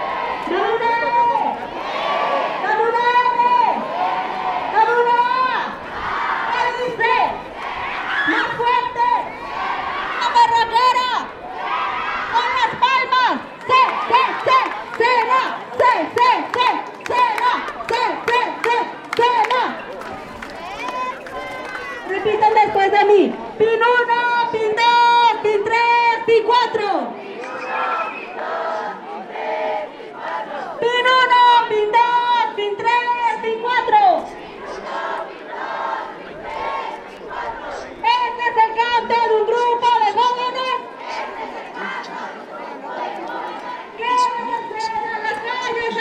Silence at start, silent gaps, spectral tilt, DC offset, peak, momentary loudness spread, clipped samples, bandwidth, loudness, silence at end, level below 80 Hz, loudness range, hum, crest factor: 0 s; none; -3 dB/octave; under 0.1%; -4 dBFS; 14 LU; under 0.1%; 10 kHz; -18 LUFS; 0 s; -56 dBFS; 8 LU; none; 16 dB